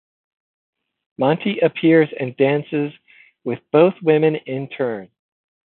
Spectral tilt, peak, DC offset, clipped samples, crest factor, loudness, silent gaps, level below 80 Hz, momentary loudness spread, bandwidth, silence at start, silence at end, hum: -12 dB/octave; -2 dBFS; under 0.1%; under 0.1%; 18 dB; -19 LUFS; none; -70 dBFS; 13 LU; 4.2 kHz; 1.2 s; 0.6 s; none